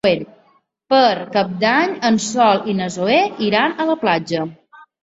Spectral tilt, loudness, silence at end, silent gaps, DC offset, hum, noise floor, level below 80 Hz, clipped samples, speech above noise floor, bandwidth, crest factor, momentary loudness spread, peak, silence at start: -4.5 dB/octave; -17 LUFS; 0.5 s; none; under 0.1%; none; -57 dBFS; -60 dBFS; under 0.1%; 41 dB; 8 kHz; 16 dB; 8 LU; -2 dBFS; 0.05 s